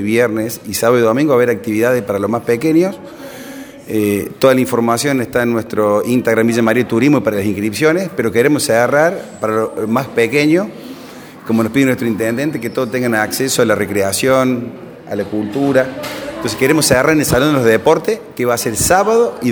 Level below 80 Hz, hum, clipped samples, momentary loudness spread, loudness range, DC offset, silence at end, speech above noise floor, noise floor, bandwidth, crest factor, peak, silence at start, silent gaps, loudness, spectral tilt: -46 dBFS; none; under 0.1%; 10 LU; 3 LU; under 0.1%; 0 s; 20 dB; -34 dBFS; over 20 kHz; 14 dB; 0 dBFS; 0 s; none; -14 LUFS; -5 dB/octave